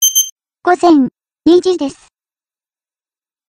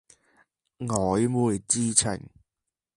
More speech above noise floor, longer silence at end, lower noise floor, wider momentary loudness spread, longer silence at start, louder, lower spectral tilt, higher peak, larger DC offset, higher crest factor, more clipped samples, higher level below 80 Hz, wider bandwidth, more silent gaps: first, over 79 dB vs 62 dB; first, 1.6 s vs 0.7 s; about the same, under -90 dBFS vs -87 dBFS; about the same, 10 LU vs 12 LU; second, 0 s vs 0.8 s; first, -13 LUFS vs -24 LUFS; second, -2 dB/octave vs -4.5 dB/octave; first, 0 dBFS vs -4 dBFS; neither; second, 14 dB vs 24 dB; neither; about the same, -54 dBFS vs -54 dBFS; first, 16 kHz vs 11.5 kHz; first, 0.32-0.36 s vs none